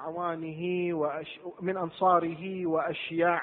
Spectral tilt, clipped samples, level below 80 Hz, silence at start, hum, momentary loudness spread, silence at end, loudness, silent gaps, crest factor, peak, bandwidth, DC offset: -10 dB/octave; under 0.1%; -72 dBFS; 0 s; none; 9 LU; 0 s; -30 LUFS; none; 18 dB; -12 dBFS; 4.3 kHz; under 0.1%